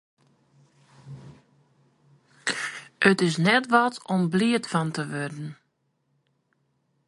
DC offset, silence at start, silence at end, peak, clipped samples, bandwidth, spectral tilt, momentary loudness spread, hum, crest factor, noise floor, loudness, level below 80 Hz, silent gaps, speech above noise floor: under 0.1%; 1.05 s; 1.55 s; -4 dBFS; under 0.1%; 11.5 kHz; -5 dB/octave; 21 LU; none; 24 dB; -73 dBFS; -24 LUFS; -70 dBFS; none; 50 dB